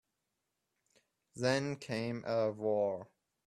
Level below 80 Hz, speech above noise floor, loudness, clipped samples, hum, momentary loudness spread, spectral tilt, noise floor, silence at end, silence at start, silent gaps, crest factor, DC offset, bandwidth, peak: -76 dBFS; 51 dB; -36 LUFS; under 0.1%; none; 6 LU; -5.5 dB/octave; -86 dBFS; 0.4 s; 1.35 s; none; 20 dB; under 0.1%; 12.5 kHz; -18 dBFS